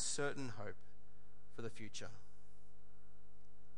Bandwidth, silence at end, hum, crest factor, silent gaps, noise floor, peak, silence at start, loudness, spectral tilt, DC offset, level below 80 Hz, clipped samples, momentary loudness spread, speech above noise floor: 11.5 kHz; 0 s; none; 22 dB; none; -69 dBFS; -28 dBFS; 0 s; -47 LUFS; -3 dB/octave; 1%; -72 dBFS; under 0.1%; 19 LU; 22 dB